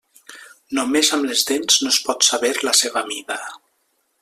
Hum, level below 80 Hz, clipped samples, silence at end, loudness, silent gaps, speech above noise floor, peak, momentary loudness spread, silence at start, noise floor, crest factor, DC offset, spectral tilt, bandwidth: none; -66 dBFS; under 0.1%; 0.65 s; -17 LUFS; none; 48 dB; -2 dBFS; 12 LU; 0.3 s; -67 dBFS; 20 dB; under 0.1%; 0.5 dB/octave; 16 kHz